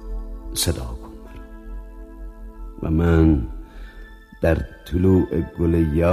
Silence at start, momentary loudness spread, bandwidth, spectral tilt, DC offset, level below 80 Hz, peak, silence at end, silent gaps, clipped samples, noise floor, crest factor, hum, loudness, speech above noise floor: 0 s; 23 LU; 15.5 kHz; -6.5 dB/octave; under 0.1%; -30 dBFS; -4 dBFS; 0 s; none; under 0.1%; -41 dBFS; 18 dB; none; -21 LUFS; 22 dB